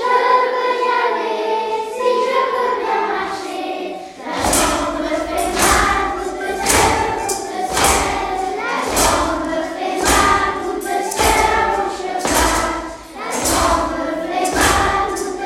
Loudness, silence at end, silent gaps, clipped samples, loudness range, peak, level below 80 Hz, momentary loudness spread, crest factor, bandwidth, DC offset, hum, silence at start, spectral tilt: -17 LUFS; 0 s; none; under 0.1%; 3 LU; 0 dBFS; -34 dBFS; 9 LU; 18 dB; 16.5 kHz; under 0.1%; none; 0 s; -2.5 dB/octave